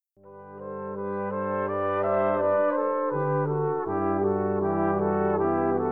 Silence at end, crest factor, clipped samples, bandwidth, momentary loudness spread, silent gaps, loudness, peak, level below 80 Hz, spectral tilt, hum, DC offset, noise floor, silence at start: 0 s; 14 dB; under 0.1%; 3.7 kHz; 9 LU; none; -26 LUFS; -12 dBFS; -74 dBFS; -11.5 dB/octave; none; 0.2%; -48 dBFS; 0.25 s